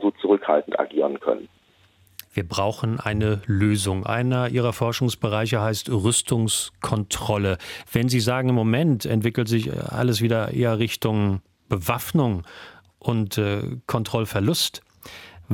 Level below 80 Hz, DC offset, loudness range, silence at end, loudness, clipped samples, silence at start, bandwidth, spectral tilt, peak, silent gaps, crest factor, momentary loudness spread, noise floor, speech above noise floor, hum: -52 dBFS; under 0.1%; 3 LU; 0 s; -23 LUFS; under 0.1%; 0 s; 17.5 kHz; -5.5 dB/octave; -4 dBFS; none; 20 dB; 9 LU; -59 dBFS; 36 dB; none